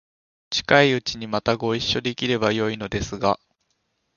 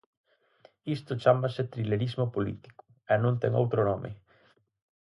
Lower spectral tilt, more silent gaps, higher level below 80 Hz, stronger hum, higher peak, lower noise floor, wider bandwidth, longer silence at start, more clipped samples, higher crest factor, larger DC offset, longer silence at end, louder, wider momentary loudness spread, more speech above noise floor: second, -4.5 dB/octave vs -8.5 dB/octave; neither; first, -48 dBFS vs -60 dBFS; neither; first, 0 dBFS vs -8 dBFS; first, -72 dBFS vs -65 dBFS; second, 7.4 kHz vs 11 kHz; second, 0.5 s vs 0.85 s; neither; about the same, 24 dB vs 22 dB; neither; second, 0.8 s vs 0.95 s; first, -22 LUFS vs -29 LUFS; second, 10 LU vs 15 LU; first, 50 dB vs 38 dB